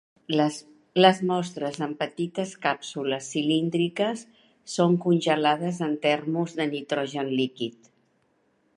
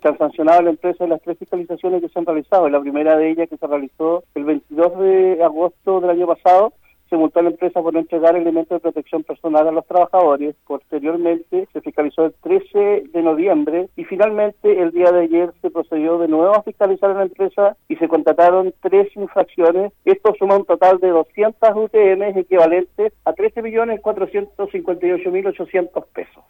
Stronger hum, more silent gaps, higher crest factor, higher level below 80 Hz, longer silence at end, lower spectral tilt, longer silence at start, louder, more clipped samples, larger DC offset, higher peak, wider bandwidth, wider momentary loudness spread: neither; neither; first, 22 dB vs 12 dB; second, -76 dBFS vs -62 dBFS; first, 1.05 s vs 0.25 s; second, -5.5 dB/octave vs -8 dB/octave; first, 0.3 s vs 0.05 s; second, -26 LUFS vs -17 LUFS; neither; neither; about the same, -4 dBFS vs -4 dBFS; second, 11.5 kHz vs 17 kHz; about the same, 9 LU vs 9 LU